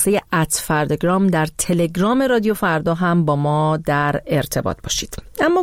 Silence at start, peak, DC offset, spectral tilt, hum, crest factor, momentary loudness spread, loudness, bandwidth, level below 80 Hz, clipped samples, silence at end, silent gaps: 0 s; -4 dBFS; 0.1%; -5 dB/octave; none; 14 dB; 6 LU; -18 LUFS; 16.5 kHz; -42 dBFS; under 0.1%; 0 s; none